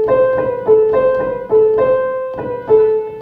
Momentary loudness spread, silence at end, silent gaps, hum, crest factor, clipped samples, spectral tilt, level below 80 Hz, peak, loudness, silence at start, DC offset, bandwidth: 8 LU; 0 s; none; none; 12 dB; under 0.1%; -9 dB/octave; -46 dBFS; -2 dBFS; -14 LUFS; 0 s; under 0.1%; 3.9 kHz